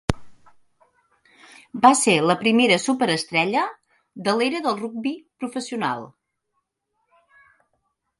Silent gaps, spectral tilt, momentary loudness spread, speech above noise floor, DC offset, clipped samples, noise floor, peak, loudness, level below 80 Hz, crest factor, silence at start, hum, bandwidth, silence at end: none; -3.5 dB/octave; 14 LU; 55 dB; under 0.1%; under 0.1%; -76 dBFS; 0 dBFS; -21 LUFS; -50 dBFS; 24 dB; 0.1 s; none; 11.5 kHz; 2.1 s